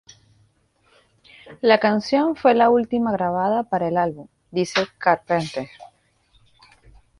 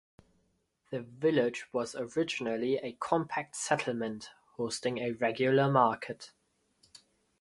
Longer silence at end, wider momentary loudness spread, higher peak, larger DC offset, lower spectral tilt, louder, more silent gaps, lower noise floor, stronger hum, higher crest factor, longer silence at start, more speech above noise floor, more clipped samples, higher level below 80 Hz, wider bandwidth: first, 1.35 s vs 0.45 s; about the same, 12 LU vs 14 LU; first, -4 dBFS vs -10 dBFS; neither; about the same, -5.5 dB/octave vs -5 dB/octave; first, -20 LUFS vs -32 LUFS; neither; second, -62 dBFS vs -75 dBFS; neither; about the same, 20 dB vs 22 dB; first, 1.45 s vs 0.9 s; about the same, 42 dB vs 44 dB; neither; first, -58 dBFS vs -72 dBFS; about the same, 11 kHz vs 11.5 kHz